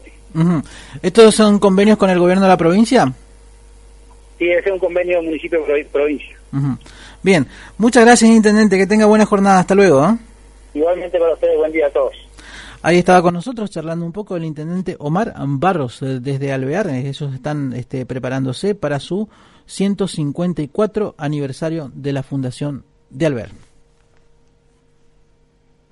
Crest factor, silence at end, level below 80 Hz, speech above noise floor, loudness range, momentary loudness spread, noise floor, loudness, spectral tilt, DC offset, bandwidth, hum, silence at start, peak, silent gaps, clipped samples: 16 dB; 2.4 s; -44 dBFS; 40 dB; 10 LU; 14 LU; -55 dBFS; -15 LUFS; -6 dB/octave; under 0.1%; 11.5 kHz; none; 0.05 s; 0 dBFS; none; under 0.1%